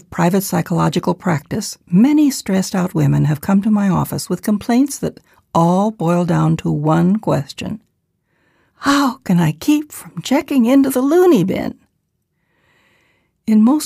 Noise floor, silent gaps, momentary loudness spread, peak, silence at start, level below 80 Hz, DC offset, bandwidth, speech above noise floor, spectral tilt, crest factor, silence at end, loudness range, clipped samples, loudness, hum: -69 dBFS; none; 11 LU; -2 dBFS; 0.1 s; -50 dBFS; under 0.1%; 15.5 kHz; 54 dB; -6.5 dB/octave; 14 dB; 0 s; 3 LU; under 0.1%; -16 LUFS; none